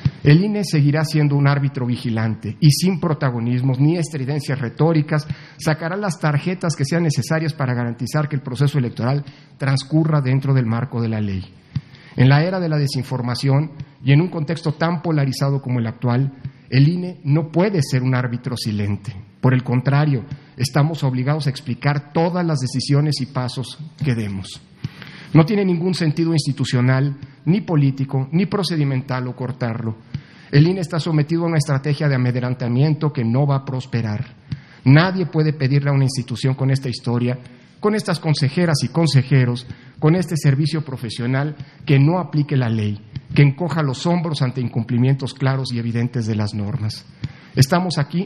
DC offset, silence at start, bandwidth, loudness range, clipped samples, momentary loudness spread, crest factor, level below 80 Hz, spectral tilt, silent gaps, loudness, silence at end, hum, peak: under 0.1%; 0 s; 12.5 kHz; 2 LU; under 0.1%; 10 LU; 18 dB; -54 dBFS; -7 dB/octave; none; -19 LUFS; 0 s; none; 0 dBFS